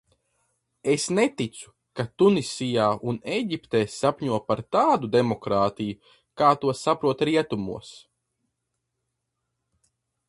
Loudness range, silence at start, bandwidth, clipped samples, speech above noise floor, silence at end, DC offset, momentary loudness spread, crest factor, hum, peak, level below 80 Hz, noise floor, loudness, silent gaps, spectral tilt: 4 LU; 0.85 s; 11.5 kHz; under 0.1%; 56 dB; 2.3 s; under 0.1%; 12 LU; 20 dB; none; -6 dBFS; -60 dBFS; -80 dBFS; -24 LUFS; none; -5.5 dB/octave